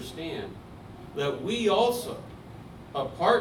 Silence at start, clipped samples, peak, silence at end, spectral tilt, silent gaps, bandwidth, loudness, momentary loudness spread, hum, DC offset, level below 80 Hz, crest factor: 0 s; under 0.1%; -8 dBFS; 0 s; -4.5 dB/octave; none; 18 kHz; -29 LUFS; 21 LU; none; under 0.1%; -54 dBFS; 20 dB